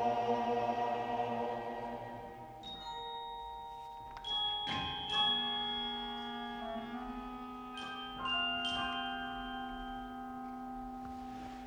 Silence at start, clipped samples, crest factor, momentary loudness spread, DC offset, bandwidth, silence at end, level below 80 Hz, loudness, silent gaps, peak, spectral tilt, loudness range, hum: 0 s; under 0.1%; 18 dB; 13 LU; under 0.1%; over 20 kHz; 0 s; -60 dBFS; -38 LUFS; none; -22 dBFS; -4 dB/octave; 5 LU; none